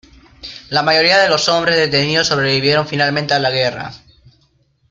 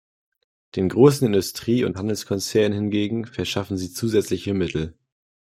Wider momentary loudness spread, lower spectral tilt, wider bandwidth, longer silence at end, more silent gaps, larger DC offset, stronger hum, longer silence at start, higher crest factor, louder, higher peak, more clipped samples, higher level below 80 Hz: first, 18 LU vs 11 LU; second, -3.5 dB/octave vs -6 dB/octave; second, 12 kHz vs 16 kHz; first, 0.95 s vs 0.65 s; neither; neither; neither; second, 0.45 s vs 0.75 s; about the same, 16 dB vs 20 dB; first, -14 LUFS vs -22 LUFS; about the same, 0 dBFS vs -2 dBFS; neither; about the same, -50 dBFS vs -54 dBFS